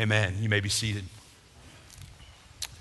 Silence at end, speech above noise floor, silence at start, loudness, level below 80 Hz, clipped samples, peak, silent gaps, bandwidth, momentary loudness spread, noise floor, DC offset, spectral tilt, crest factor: 0 s; 26 dB; 0 s; -28 LUFS; -50 dBFS; under 0.1%; -10 dBFS; none; 12.5 kHz; 24 LU; -53 dBFS; under 0.1%; -4 dB/octave; 22 dB